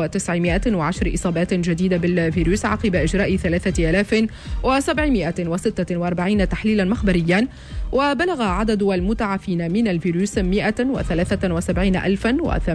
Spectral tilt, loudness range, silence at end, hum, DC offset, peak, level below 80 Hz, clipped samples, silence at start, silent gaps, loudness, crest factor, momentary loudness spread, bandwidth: -6 dB/octave; 1 LU; 0 s; none; under 0.1%; -8 dBFS; -30 dBFS; under 0.1%; 0 s; none; -20 LUFS; 12 dB; 4 LU; 11 kHz